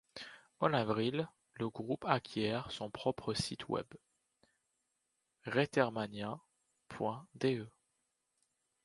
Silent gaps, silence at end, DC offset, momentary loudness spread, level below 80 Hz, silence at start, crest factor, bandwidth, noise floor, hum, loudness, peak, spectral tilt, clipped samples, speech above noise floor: none; 1.15 s; under 0.1%; 16 LU; -70 dBFS; 0.15 s; 26 dB; 11.5 kHz; -84 dBFS; none; -37 LUFS; -12 dBFS; -5.5 dB/octave; under 0.1%; 47 dB